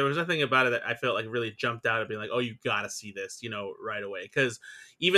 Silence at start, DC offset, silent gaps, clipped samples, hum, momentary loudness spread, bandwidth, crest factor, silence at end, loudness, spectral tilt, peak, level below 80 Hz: 0 s; under 0.1%; none; under 0.1%; none; 12 LU; 14.5 kHz; 22 dB; 0 s; -29 LUFS; -4 dB/octave; -8 dBFS; -72 dBFS